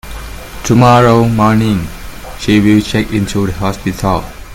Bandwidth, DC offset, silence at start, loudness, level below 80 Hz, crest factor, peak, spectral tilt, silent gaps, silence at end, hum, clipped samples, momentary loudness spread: 17 kHz; under 0.1%; 0.05 s; -11 LUFS; -30 dBFS; 12 dB; 0 dBFS; -6.5 dB/octave; none; 0 s; none; 0.3%; 20 LU